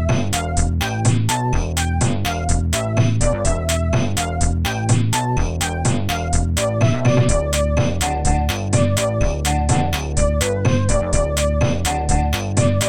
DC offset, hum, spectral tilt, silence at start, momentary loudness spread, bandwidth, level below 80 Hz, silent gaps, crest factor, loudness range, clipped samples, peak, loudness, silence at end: under 0.1%; none; -5 dB/octave; 0 s; 3 LU; 18 kHz; -26 dBFS; none; 14 dB; 1 LU; under 0.1%; -4 dBFS; -19 LUFS; 0 s